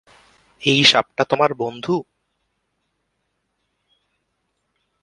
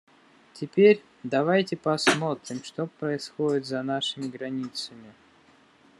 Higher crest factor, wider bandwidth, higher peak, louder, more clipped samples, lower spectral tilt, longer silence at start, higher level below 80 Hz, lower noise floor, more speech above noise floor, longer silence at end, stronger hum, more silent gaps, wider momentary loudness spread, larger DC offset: about the same, 24 dB vs 20 dB; about the same, 11.5 kHz vs 12 kHz; first, 0 dBFS vs -6 dBFS; first, -17 LUFS vs -26 LUFS; neither; second, -3.5 dB/octave vs -5 dB/octave; about the same, 0.6 s vs 0.55 s; first, -62 dBFS vs -74 dBFS; first, -73 dBFS vs -58 dBFS; first, 55 dB vs 32 dB; first, 3 s vs 0.9 s; neither; neither; about the same, 12 LU vs 14 LU; neither